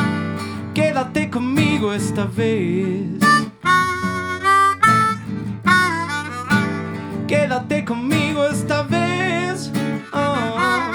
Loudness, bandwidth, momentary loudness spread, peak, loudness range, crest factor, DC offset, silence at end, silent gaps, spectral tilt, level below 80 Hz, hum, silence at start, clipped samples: -19 LUFS; 19.5 kHz; 9 LU; -2 dBFS; 4 LU; 16 dB; under 0.1%; 0 s; none; -5 dB/octave; -52 dBFS; none; 0 s; under 0.1%